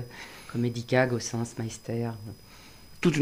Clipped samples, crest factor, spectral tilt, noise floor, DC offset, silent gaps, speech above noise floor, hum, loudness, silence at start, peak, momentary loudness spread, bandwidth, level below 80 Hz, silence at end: under 0.1%; 20 dB; -5.5 dB/octave; -49 dBFS; under 0.1%; none; 20 dB; none; -30 LUFS; 0 s; -10 dBFS; 22 LU; 15.5 kHz; -58 dBFS; 0 s